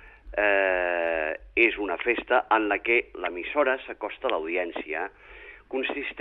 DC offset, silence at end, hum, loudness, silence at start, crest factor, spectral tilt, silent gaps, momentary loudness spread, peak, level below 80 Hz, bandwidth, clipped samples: under 0.1%; 0 s; none; -26 LUFS; 0 s; 20 dB; -6.5 dB/octave; none; 12 LU; -6 dBFS; -54 dBFS; 4.3 kHz; under 0.1%